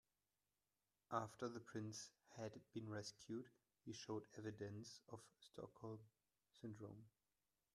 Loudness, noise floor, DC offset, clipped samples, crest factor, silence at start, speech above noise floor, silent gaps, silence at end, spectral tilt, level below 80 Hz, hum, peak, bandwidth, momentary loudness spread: -54 LUFS; under -90 dBFS; under 0.1%; under 0.1%; 26 dB; 1.1 s; over 36 dB; none; 0.65 s; -5 dB/octave; -86 dBFS; none; -30 dBFS; 13 kHz; 11 LU